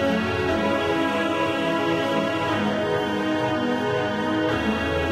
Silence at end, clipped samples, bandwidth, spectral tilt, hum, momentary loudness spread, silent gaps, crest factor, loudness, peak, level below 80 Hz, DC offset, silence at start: 0 s; under 0.1%; 14.5 kHz; -5.5 dB/octave; none; 1 LU; none; 12 dB; -23 LUFS; -10 dBFS; -46 dBFS; under 0.1%; 0 s